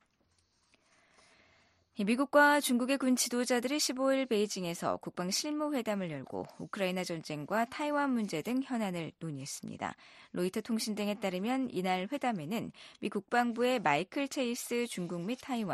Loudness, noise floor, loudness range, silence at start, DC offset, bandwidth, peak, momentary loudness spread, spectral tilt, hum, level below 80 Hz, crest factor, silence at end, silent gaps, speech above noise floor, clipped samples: -33 LUFS; -74 dBFS; 6 LU; 1.95 s; under 0.1%; 13 kHz; -14 dBFS; 12 LU; -4 dB/octave; none; -76 dBFS; 20 dB; 0 s; none; 41 dB; under 0.1%